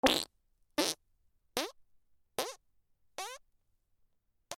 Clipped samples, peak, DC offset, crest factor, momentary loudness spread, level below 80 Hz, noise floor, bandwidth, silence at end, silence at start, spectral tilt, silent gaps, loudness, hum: under 0.1%; -10 dBFS; under 0.1%; 30 dB; 14 LU; -66 dBFS; -74 dBFS; over 20 kHz; 0 s; 0.05 s; -1.5 dB/octave; none; -37 LUFS; none